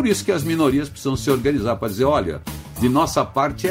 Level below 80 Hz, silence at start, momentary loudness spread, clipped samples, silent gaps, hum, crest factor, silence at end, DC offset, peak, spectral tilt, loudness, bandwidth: -40 dBFS; 0 s; 6 LU; under 0.1%; none; none; 16 dB; 0 s; under 0.1%; -4 dBFS; -5.5 dB/octave; -20 LUFS; 16 kHz